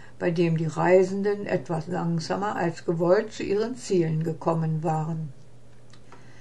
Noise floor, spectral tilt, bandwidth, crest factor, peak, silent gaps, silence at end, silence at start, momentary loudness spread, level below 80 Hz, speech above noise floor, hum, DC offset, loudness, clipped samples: -52 dBFS; -7 dB/octave; 10.5 kHz; 18 dB; -8 dBFS; none; 0.1 s; 0 s; 8 LU; -60 dBFS; 27 dB; none; 0.8%; -26 LUFS; under 0.1%